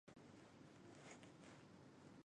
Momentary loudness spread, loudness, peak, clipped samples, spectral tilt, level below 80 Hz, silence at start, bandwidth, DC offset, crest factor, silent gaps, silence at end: 4 LU; -63 LUFS; -46 dBFS; under 0.1%; -5 dB/octave; -86 dBFS; 0.05 s; 10.5 kHz; under 0.1%; 16 dB; none; 0 s